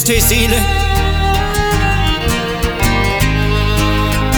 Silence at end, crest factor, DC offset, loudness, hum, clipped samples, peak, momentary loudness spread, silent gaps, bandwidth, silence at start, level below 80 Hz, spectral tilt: 0 s; 12 dB; under 0.1%; -14 LUFS; none; under 0.1%; 0 dBFS; 5 LU; none; over 20 kHz; 0 s; -18 dBFS; -4 dB/octave